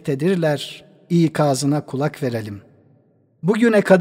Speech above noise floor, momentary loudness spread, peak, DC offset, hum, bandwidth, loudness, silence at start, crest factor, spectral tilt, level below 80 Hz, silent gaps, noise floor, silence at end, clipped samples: 39 dB; 16 LU; 0 dBFS; under 0.1%; none; 16 kHz; -19 LUFS; 0.05 s; 18 dB; -6.5 dB/octave; -64 dBFS; none; -57 dBFS; 0 s; under 0.1%